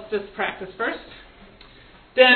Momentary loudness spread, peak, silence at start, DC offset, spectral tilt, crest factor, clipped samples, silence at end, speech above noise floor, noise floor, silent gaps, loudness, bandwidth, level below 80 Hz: 22 LU; 0 dBFS; 0 s; under 0.1%; -6 dB/octave; 22 dB; under 0.1%; 0 s; 20 dB; -49 dBFS; none; -25 LUFS; 4.5 kHz; -54 dBFS